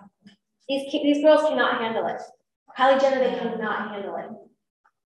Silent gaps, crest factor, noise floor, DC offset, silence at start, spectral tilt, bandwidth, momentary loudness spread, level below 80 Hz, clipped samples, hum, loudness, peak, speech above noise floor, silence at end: 2.56-2.66 s; 18 dB; -56 dBFS; under 0.1%; 0.7 s; -4.5 dB/octave; 11.5 kHz; 16 LU; -76 dBFS; under 0.1%; none; -23 LUFS; -6 dBFS; 34 dB; 0.75 s